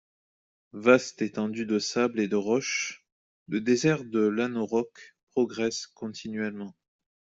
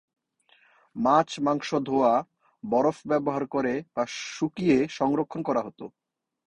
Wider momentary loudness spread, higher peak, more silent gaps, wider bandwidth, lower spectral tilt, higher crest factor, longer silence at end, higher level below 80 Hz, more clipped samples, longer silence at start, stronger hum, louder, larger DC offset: first, 13 LU vs 9 LU; first, -4 dBFS vs -8 dBFS; first, 3.12-3.46 s, 5.23-5.27 s vs none; second, 8 kHz vs 9.8 kHz; second, -4.5 dB/octave vs -6 dB/octave; about the same, 24 dB vs 20 dB; about the same, 0.7 s vs 0.6 s; second, -70 dBFS vs -64 dBFS; neither; second, 0.75 s vs 0.95 s; neither; about the same, -28 LUFS vs -26 LUFS; neither